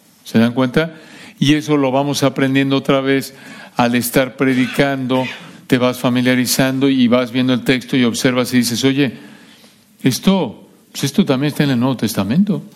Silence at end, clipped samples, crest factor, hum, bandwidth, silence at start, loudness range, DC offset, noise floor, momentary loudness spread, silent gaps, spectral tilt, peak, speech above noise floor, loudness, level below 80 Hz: 0.05 s; under 0.1%; 14 dB; none; 16.5 kHz; 0.25 s; 3 LU; under 0.1%; -47 dBFS; 5 LU; none; -5 dB/octave; -2 dBFS; 31 dB; -16 LUFS; -52 dBFS